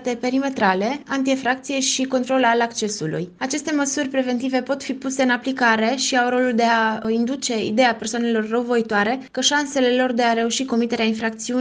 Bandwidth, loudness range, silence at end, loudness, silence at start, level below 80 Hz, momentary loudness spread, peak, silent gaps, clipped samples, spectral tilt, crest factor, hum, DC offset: 10 kHz; 2 LU; 0 s; -20 LUFS; 0 s; -62 dBFS; 6 LU; -4 dBFS; none; under 0.1%; -3 dB/octave; 16 dB; none; under 0.1%